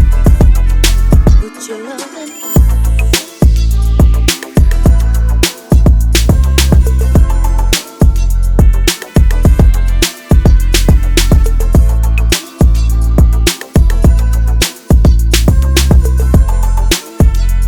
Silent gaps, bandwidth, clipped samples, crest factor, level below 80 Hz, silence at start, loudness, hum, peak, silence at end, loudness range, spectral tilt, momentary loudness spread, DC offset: none; 19 kHz; 0.6%; 8 dB; -10 dBFS; 0 s; -11 LUFS; none; 0 dBFS; 0 s; 2 LU; -5 dB/octave; 5 LU; under 0.1%